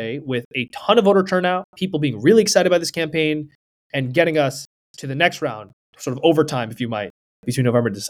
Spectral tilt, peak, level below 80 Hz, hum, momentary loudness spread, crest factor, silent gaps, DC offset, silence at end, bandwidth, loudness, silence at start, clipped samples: -5 dB/octave; 0 dBFS; -62 dBFS; none; 16 LU; 18 dB; 0.45-0.51 s, 1.64-1.73 s, 3.55-3.90 s, 4.66-4.94 s, 5.73-5.93 s, 7.10-7.43 s; under 0.1%; 0 s; 18.5 kHz; -19 LUFS; 0 s; under 0.1%